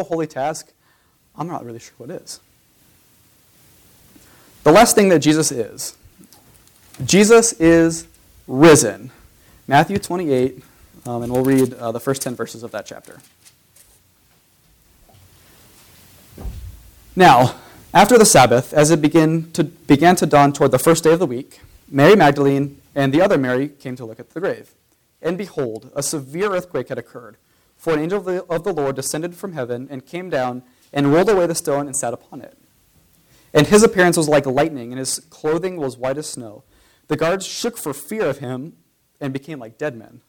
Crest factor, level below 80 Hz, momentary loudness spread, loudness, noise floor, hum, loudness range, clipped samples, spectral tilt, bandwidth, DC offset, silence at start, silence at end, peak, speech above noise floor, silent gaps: 16 dB; -48 dBFS; 20 LU; -17 LUFS; -59 dBFS; none; 11 LU; under 0.1%; -4.5 dB/octave; 19 kHz; under 0.1%; 0 s; 0.3 s; -4 dBFS; 42 dB; none